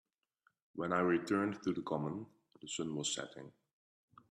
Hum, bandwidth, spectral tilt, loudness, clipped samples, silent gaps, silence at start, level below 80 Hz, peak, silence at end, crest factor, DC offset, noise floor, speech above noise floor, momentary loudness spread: none; 13 kHz; -4.5 dB/octave; -37 LUFS; under 0.1%; none; 0.75 s; -78 dBFS; -20 dBFS; 0.8 s; 20 dB; under 0.1%; -78 dBFS; 41 dB; 22 LU